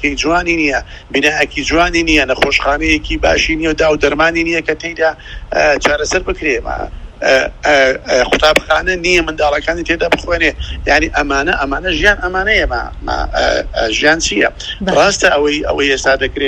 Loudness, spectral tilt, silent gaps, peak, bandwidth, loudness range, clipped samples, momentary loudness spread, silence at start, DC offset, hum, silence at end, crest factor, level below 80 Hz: -13 LUFS; -3.5 dB/octave; none; 0 dBFS; 15.5 kHz; 2 LU; 0.1%; 7 LU; 0 s; under 0.1%; none; 0 s; 14 dB; -28 dBFS